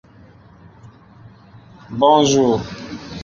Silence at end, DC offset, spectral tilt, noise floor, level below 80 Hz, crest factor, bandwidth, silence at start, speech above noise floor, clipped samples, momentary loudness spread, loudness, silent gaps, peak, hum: 0 s; under 0.1%; -5 dB/octave; -46 dBFS; -50 dBFS; 18 dB; 7.4 kHz; 1.9 s; 30 dB; under 0.1%; 19 LU; -15 LUFS; none; -2 dBFS; none